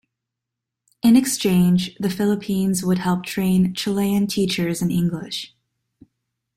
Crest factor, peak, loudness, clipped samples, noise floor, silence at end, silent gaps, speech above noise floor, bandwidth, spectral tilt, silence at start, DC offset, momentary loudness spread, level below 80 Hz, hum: 16 dB; -4 dBFS; -20 LUFS; under 0.1%; -84 dBFS; 1.1 s; none; 64 dB; 16 kHz; -5.5 dB/octave; 1.05 s; under 0.1%; 8 LU; -54 dBFS; none